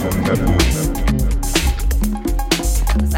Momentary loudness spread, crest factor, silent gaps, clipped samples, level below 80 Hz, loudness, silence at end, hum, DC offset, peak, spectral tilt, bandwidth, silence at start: 4 LU; 16 dB; none; under 0.1%; -18 dBFS; -18 LUFS; 0 s; none; under 0.1%; 0 dBFS; -5 dB/octave; 17 kHz; 0 s